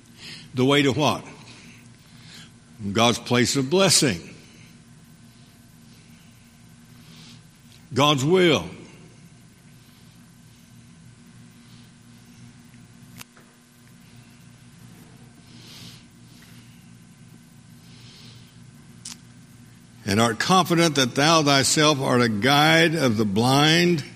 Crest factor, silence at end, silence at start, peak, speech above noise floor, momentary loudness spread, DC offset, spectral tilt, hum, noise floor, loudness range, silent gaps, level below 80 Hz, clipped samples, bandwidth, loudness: 24 dB; 0.05 s; 0.2 s; 0 dBFS; 33 dB; 27 LU; under 0.1%; -4 dB/octave; 60 Hz at -55 dBFS; -52 dBFS; 15 LU; none; -60 dBFS; under 0.1%; 15.5 kHz; -19 LUFS